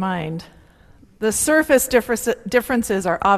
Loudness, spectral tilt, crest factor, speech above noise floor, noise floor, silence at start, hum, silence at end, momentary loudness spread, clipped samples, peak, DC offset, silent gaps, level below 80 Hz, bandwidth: -19 LUFS; -4 dB/octave; 18 dB; 31 dB; -49 dBFS; 0 s; none; 0 s; 10 LU; under 0.1%; -2 dBFS; under 0.1%; none; -46 dBFS; 15 kHz